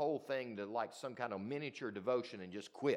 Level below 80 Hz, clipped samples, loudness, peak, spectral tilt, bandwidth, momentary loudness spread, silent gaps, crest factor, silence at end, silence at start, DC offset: under -90 dBFS; under 0.1%; -42 LUFS; -22 dBFS; -5.5 dB/octave; 14 kHz; 7 LU; none; 18 dB; 0 s; 0 s; under 0.1%